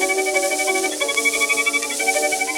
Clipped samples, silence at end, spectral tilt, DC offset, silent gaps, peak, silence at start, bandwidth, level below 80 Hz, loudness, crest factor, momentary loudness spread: under 0.1%; 0 s; 1 dB/octave; under 0.1%; none; -2 dBFS; 0 s; 17.5 kHz; -62 dBFS; -18 LUFS; 18 dB; 3 LU